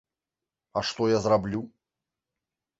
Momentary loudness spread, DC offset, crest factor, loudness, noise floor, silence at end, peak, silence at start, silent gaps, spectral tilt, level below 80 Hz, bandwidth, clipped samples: 12 LU; under 0.1%; 20 dB; -27 LUFS; -89 dBFS; 1.1 s; -10 dBFS; 0.75 s; none; -5.5 dB/octave; -58 dBFS; 8 kHz; under 0.1%